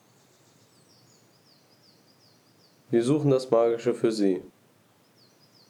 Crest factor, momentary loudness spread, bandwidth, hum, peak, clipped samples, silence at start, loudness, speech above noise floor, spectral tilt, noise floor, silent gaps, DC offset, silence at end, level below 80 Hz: 20 dB; 5 LU; 12.5 kHz; none; -8 dBFS; under 0.1%; 2.9 s; -25 LUFS; 38 dB; -7 dB/octave; -62 dBFS; none; under 0.1%; 1.2 s; -82 dBFS